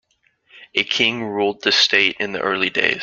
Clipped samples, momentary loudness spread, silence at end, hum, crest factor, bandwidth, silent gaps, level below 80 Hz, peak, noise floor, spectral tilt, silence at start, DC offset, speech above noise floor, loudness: under 0.1%; 8 LU; 0 s; none; 20 dB; 7.6 kHz; none; -62 dBFS; -2 dBFS; -60 dBFS; -2.5 dB/octave; 0.55 s; under 0.1%; 41 dB; -17 LUFS